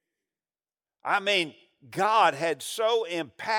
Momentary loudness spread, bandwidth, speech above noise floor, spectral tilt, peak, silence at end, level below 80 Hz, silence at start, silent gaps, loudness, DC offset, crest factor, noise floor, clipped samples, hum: 12 LU; 17.5 kHz; over 64 dB; -3 dB/octave; -10 dBFS; 0 s; -84 dBFS; 1.05 s; none; -26 LUFS; under 0.1%; 18 dB; under -90 dBFS; under 0.1%; none